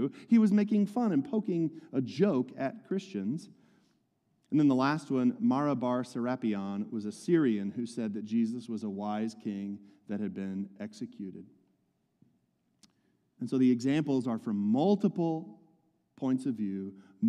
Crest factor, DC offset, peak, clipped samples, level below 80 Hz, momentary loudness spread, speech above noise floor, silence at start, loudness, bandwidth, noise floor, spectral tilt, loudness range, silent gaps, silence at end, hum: 16 dB; under 0.1%; -14 dBFS; under 0.1%; -82 dBFS; 14 LU; 45 dB; 0 s; -31 LUFS; 10.5 kHz; -75 dBFS; -7.5 dB/octave; 10 LU; none; 0 s; none